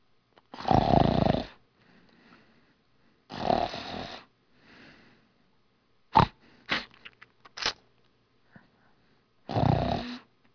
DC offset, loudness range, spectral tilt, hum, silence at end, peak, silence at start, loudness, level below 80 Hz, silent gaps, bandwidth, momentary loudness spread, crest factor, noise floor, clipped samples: under 0.1%; 7 LU; -6.5 dB/octave; none; 0.35 s; -6 dBFS; 0.55 s; -28 LUFS; -46 dBFS; none; 5.4 kHz; 22 LU; 26 dB; -69 dBFS; under 0.1%